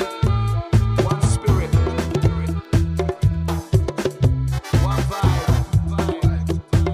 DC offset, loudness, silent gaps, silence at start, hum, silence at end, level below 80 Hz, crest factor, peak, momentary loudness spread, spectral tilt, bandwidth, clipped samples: under 0.1%; -20 LUFS; none; 0 s; none; 0 s; -26 dBFS; 16 dB; -4 dBFS; 4 LU; -7 dB/octave; 15 kHz; under 0.1%